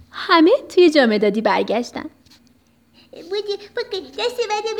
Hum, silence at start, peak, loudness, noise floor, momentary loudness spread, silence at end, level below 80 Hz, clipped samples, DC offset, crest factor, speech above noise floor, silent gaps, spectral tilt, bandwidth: none; 0.15 s; -2 dBFS; -18 LUFS; -56 dBFS; 14 LU; 0 s; -64 dBFS; under 0.1%; under 0.1%; 18 dB; 38 dB; none; -4.5 dB/octave; 12 kHz